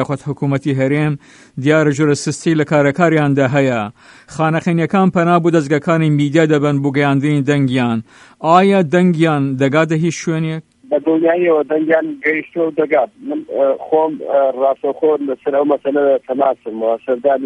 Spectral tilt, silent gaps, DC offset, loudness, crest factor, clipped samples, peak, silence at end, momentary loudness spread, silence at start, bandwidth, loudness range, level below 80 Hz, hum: -7 dB/octave; none; under 0.1%; -15 LUFS; 14 dB; under 0.1%; 0 dBFS; 0 s; 7 LU; 0 s; 10.5 kHz; 2 LU; -58 dBFS; none